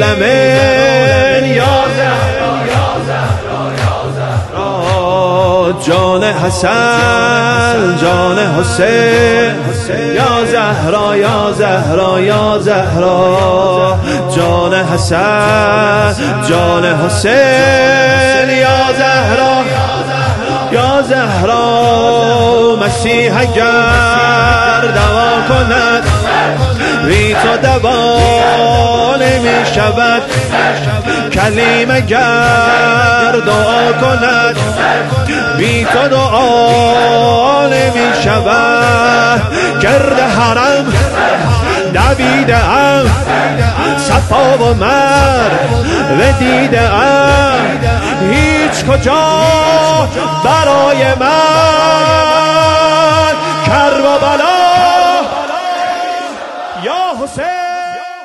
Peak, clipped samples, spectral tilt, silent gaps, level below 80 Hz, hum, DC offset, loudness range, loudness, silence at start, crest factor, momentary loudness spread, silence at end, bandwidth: 0 dBFS; under 0.1%; -5 dB/octave; none; -28 dBFS; none; 0.2%; 2 LU; -9 LUFS; 0 s; 10 dB; 6 LU; 0 s; 12.5 kHz